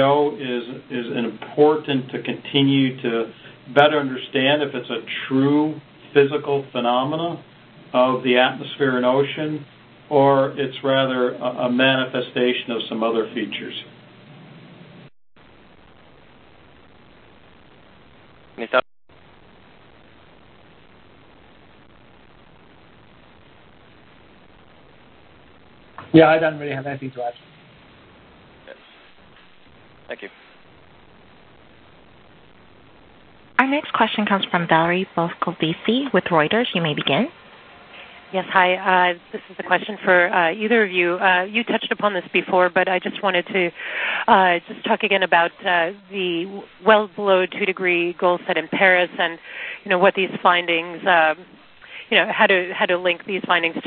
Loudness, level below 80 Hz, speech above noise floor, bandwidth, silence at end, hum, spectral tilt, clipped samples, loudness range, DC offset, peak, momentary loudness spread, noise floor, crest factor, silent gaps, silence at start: -19 LUFS; -62 dBFS; 31 dB; 4.6 kHz; 0 s; none; -8.5 dB/octave; under 0.1%; 12 LU; under 0.1%; 0 dBFS; 12 LU; -50 dBFS; 22 dB; none; 0 s